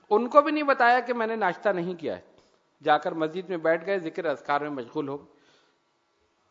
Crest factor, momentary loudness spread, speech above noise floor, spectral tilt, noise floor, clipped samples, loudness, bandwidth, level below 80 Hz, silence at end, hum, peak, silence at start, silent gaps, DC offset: 24 dB; 13 LU; 45 dB; -6.5 dB/octave; -70 dBFS; under 0.1%; -26 LUFS; 7.6 kHz; -80 dBFS; 1.3 s; none; -2 dBFS; 0.1 s; none; under 0.1%